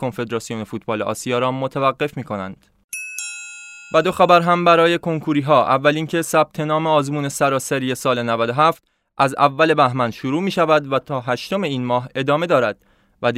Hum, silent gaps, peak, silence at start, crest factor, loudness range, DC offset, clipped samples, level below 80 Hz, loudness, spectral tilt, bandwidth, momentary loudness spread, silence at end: none; 2.84-2.89 s; 0 dBFS; 0 s; 18 dB; 7 LU; under 0.1%; under 0.1%; -60 dBFS; -19 LUFS; -5 dB/octave; 16 kHz; 13 LU; 0 s